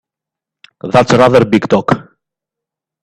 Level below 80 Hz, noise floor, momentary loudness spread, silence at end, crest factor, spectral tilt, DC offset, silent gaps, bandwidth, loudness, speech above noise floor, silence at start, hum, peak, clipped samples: -46 dBFS; -84 dBFS; 10 LU; 1 s; 14 dB; -6.5 dB/octave; under 0.1%; none; 12 kHz; -11 LUFS; 74 dB; 0.85 s; none; 0 dBFS; under 0.1%